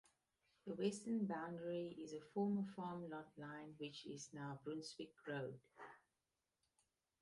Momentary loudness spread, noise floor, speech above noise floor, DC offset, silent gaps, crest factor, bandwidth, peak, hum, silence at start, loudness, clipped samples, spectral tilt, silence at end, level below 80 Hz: 12 LU; under -90 dBFS; over 43 dB; under 0.1%; none; 20 dB; 11.5 kHz; -30 dBFS; none; 0.65 s; -48 LUFS; under 0.1%; -6 dB/octave; 1.25 s; -86 dBFS